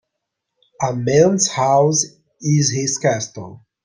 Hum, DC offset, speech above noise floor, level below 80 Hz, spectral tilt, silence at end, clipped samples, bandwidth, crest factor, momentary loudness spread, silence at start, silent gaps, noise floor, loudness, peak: none; under 0.1%; 62 dB; -56 dBFS; -4.5 dB/octave; 0.3 s; under 0.1%; 10.5 kHz; 16 dB; 13 LU; 0.8 s; none; -78 dBFS; -17 LUFS; -2 dBFS